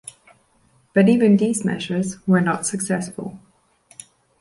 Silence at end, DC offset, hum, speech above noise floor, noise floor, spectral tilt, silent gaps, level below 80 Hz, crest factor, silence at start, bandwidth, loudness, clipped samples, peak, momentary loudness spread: 1.05 s; under 0.1%; none; 41 dB; -60 dBFS; -6 dB/octave; none; -62 dBFS; 16 dB; 0.95 s; 11.5 kHz; -19 LUFS; under 0.1%; -4 dBFS; 16 LU